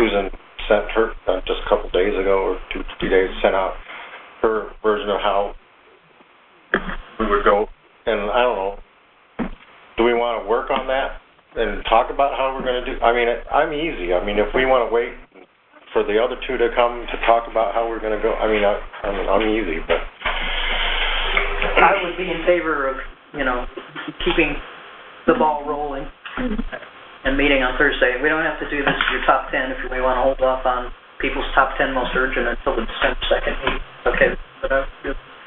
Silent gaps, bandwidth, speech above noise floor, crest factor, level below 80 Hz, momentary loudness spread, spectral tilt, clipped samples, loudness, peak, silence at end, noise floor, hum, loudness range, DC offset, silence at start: none; 4.1 kHz; 33 dB; 20 dB; -32 dBFS; 12 LU; -8 dB/octave; under 0.1%; -20 LUFS; 0 dBFS; 0 s; -53 dBFS; none; 4 LU; under 0.1%; 0 s